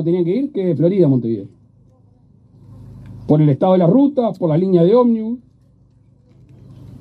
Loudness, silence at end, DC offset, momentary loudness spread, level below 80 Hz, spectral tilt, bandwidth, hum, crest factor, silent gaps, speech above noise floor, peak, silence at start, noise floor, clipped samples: -15 LUFS; 0.15 s; under 0.1%; 14 LU; -54 dBFS; -11.5 dB/octave; 4.6 kHz; none; 14 dB; none; 37 dB; -2 dBFS; 0 s; -51 dBFS; under 0.1%